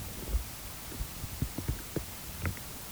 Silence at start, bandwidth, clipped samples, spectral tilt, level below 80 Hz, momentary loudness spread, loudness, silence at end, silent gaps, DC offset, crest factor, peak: 0 s; over 20 kHz; under 0.1%; -4 dB/octave; -42 dBFS; 4 LU; -38 LUFS; 0 s; none; under 0.1%; 18 dB; -18 dBFS